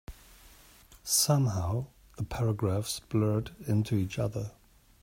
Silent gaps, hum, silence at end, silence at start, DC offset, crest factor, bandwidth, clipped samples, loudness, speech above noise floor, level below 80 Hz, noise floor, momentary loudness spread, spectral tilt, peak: none; none; 0.5 s; 0.1 s; under 0.1%; 18 dB; 16 kHz; under 0.1%; -30 LUFS; 27 dB; -54 dBFS; -56 dBFS; 15 LU; -5 dB/octave; -12 dBFS